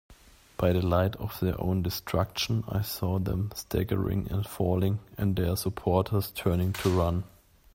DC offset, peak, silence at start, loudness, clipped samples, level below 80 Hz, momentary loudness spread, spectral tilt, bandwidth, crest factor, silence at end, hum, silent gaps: under 0.1%; -10 dBFS; 0.1 s; -29 LUFS; under 0.1%; -48 dBFS; 5 LU; -6.5 dB/octave; 16.5 kHz; 18 dB; 0.45 s; none; none